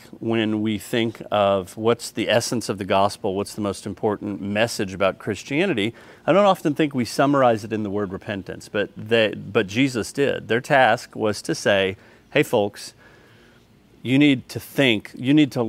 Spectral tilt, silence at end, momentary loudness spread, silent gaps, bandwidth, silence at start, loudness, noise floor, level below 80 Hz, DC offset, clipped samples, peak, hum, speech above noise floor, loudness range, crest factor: -5 dB/octave; 0 s; 10 LU; none; 16 kHz; 0.15 s; -22 LUFS; -53 dBFS; -60 dBFS; under 0.1%; under 0.1%; -2 dBFS; none; 32 dB; 3 LU; 20 dB